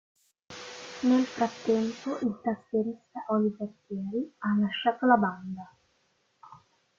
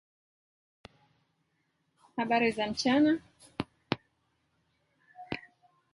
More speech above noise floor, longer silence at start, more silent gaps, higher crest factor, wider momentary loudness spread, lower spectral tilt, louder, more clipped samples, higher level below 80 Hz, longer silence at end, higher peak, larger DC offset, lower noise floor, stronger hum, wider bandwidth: second, 43 dB vs 49 dB; second, 0.5 s vs 2.15 s; neither; second, 20 dB vs 28 dB; about the same, 17 LU vs 16 LU; first, -6 dB/octave vs -4.5 dB/octave; about the same, -29 LUFS vs -31 LUFS; neither; second, -72 dBFS vs -66 dBFS; second, 0.4 s vs 0.55 s; second, -10 dBFS vs -6 dBFS; neither; second, -71 dBFS vs -77 dBFS; neither; second, 7.6 kHz vs 11.5 kHz